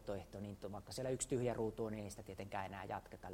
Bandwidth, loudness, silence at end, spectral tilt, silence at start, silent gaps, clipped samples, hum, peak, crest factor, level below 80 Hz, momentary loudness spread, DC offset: 16 kHz; -45 LUFS; 0 s; -5 dB/octave; 0 s; none; under 0.1%; none; -26 dBFS; 18 dB; -64 dBFS; 11 LU; under 0.1%